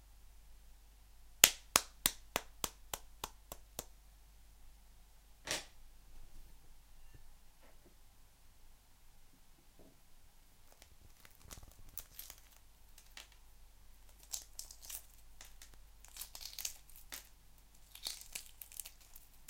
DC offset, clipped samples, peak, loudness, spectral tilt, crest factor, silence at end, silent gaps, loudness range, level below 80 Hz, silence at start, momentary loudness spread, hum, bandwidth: under 0.1%; under 0.1%; 0 dBFS; -38 LUFS; 0.5 dB/octave; 46 dB; 0 s; none; 21 LU; -60 dBFS; 0 s; 26 LU; none; 17 kHz